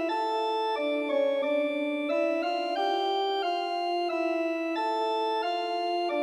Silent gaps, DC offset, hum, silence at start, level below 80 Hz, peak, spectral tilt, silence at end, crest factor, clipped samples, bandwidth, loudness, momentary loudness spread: none; under 0.1%; none; 0 s; -88 dBFS; -16 dBFS; -2 dB/octave; 0 s; 12 dB; under 0.1%; 12.5 kHz; -28 LUFS; 2 LU